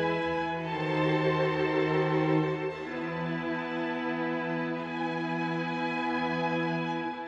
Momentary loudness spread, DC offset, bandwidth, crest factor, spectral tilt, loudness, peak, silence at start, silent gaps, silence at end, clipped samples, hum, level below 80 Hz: 6 LU; under 0.1%; 7.6 kHz; 16 dB; -7.5 dB/octave; -30 LUFS; -14 dBFS; 0 s; none; 0 s; under 0.1%; none; -62 dBFS